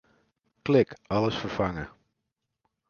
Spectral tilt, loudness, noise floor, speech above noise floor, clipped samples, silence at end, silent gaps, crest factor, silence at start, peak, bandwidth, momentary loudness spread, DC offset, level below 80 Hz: -7 dB/octave; -27 LUFS; -83 dBFS; 57 dB; under 0.1%; 1 s; none; 20 dB; 0.65 s; -8 dBFS; 7 kHz; 14 LU; under 0.1%; -54 dBFS